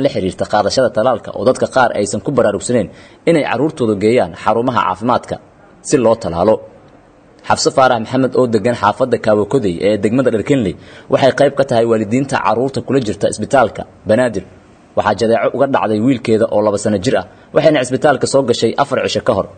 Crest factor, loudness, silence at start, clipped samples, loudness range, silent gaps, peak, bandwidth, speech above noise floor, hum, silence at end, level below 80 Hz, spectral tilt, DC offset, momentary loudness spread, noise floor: 14 dB; -14 LUFS; 0 s; under 0.1%; 2 LU; none; 0 dBFS; 9.4 kHz; 31 dB; none; 0.05 s; -50 dBFS; -5.5 dB/octave; under 0.1%; 5 LU; -44 dBFS